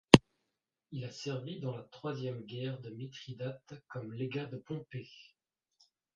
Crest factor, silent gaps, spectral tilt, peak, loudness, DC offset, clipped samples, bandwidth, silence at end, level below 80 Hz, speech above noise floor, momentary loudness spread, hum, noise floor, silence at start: 32 dB; none; -5.5 dB/octave; -2 dBFS; -36 LUFS; under 0.1%; under 0.1%; 9.6 kHz; 0.95 s; -60 dBFS; 45 dB; 8 LU; none; -86 dBFS; 0.15 s